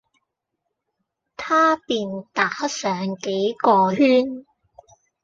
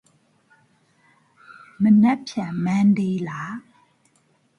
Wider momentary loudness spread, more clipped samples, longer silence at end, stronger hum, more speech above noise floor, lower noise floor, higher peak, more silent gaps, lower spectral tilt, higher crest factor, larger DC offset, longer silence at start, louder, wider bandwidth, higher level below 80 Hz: second, 10 LU vs 16 LU; neither; second, 0.8 s vs 1 s; neither; first, 59 dB vs 44 dB; first, -79 dBFS vs -63 dBFS; about the same, -4 dBFS vs -6 dBFS; neither; second, -4.5 dB/octave vs -7.5 dB/octave; about the same, 18 dB vs 16 dB; neither; about the same, 1.4 s vs 1.5 s; about the same, -20 LUFS vs -20 LUFS; about the same, 7.8 kHz vs 7.2 kHz; about the same, -66 dBFS vs -66 dBFS